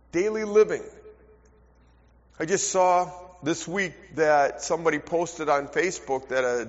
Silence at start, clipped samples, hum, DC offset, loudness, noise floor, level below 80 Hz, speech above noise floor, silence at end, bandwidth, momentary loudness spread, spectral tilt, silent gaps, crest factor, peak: 0.15 s; under 0.1%; none; under 0.1%; -25 LUFS; -57 dBFS; -58 dBFS; 33 dB; 0 s; 8 kHz; 9 LU; -3.5 dB/octave; none; 18 dB; -8 dBFS